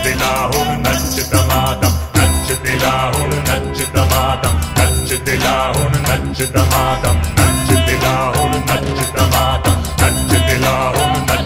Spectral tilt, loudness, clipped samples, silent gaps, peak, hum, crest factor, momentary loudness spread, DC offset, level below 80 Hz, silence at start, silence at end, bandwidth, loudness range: -4 dB/octave; -14 LUFS; under 0.1%; none; 0 dBFS; none; 14 dB; 3 LU; 0.6%; -24 dBFS; 0 s; 0 s; 16.5 kHz; 1 LU